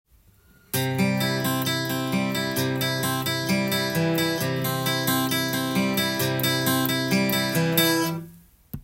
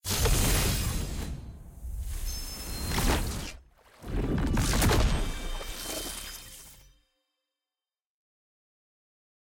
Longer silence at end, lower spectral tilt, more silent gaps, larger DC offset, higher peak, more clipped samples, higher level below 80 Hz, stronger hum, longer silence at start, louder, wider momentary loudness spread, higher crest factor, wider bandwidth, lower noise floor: second, 0 s vs 2.75 s; about the same, -4 dB/octave vs -4 dB/octave; neither; neither; first, -6 dBFS vs -14 dBFS; neither; second, -58 dBFS vs -34 dBFS; neither; first, 0.75 s vs 0.05 s; first, -23 LUFS vs -30 LUFS; second, 4 LU vs 18 LU; about the same, 18 dB vs 18 dB; about the same, 17 kHz vs 17 kHz; second, -57 dBFS vs under -90 dBFS